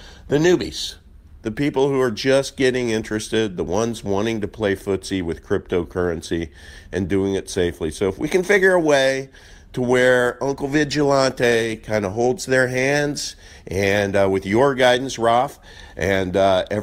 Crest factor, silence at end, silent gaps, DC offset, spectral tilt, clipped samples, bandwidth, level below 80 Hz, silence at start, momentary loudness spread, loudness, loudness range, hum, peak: 16 dB; 0 s; none; under 0.1%; -5 dB/octave; under 0.1%; 16 kHz; -44 dBFS; 0 s; 11 LU; -20 LUFS; 5 LU; none; -4 dBFS